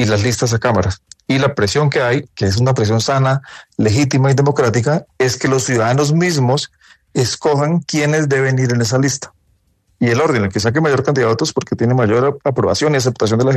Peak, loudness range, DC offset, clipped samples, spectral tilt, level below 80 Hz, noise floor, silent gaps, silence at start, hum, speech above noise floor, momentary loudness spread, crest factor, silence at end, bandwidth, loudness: -2 dBFS; 1 LU; under 0.1%; under 0.1%; -5.5 dB/octave; -50 dBFS; -59 dBFS; none; 0 s; none; 45 dB; 5 LU; 14 dB; 0 s; 13.5 kHz; -15 LUFS